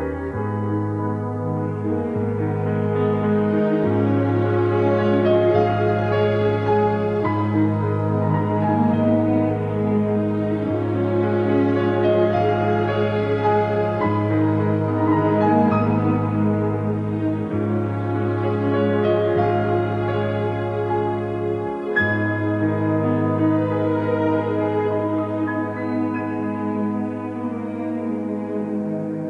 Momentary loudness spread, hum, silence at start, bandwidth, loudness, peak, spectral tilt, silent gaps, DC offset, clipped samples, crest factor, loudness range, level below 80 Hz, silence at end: 7 LU; none; 0 s; 5.4 kHz; -21 LUFS; -4 dBFS; -9.5 dB/octave; none; under 0.1%; under 0.1%; 16 dB; 4 LU; -52 dBFS; 0 s